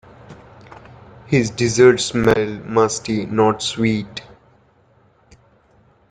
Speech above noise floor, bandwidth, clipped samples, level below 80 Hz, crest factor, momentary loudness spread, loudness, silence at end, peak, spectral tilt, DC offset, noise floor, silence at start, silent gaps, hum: 38 dB; 9.6 kHz; under 0.1%; -48 dBFS; 18 dB; 10 LU; -17 LUFS; 1.9 s; -2 dBFS; -5 dB/octave; under 0.1%; -55 dBFS; 0.3 s; none; none